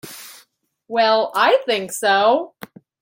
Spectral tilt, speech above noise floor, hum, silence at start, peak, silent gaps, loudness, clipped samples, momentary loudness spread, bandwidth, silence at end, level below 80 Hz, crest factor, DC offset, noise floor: -2 dB/octave; 41 dB; none; 0.05 s; -2 dBFS; none; -17 LUFS; under 0.1%; 19 LU; 17 kHz; 0.55 s; -74 dBFS; 16 dB; under 0.1%; -58 dBFS